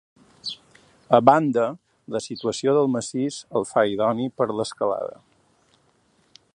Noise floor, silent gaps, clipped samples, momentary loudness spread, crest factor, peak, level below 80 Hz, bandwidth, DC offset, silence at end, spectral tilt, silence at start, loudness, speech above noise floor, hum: -63 dBFS; none; under 0.1%; 16 LU; 24 dB; 0 dBFS; -66 dBFS; 11 kHz; under 0.1%; 1.4 s; -5.5 dB/octave; 0.45 s; -23 LUFS; 41 dB; none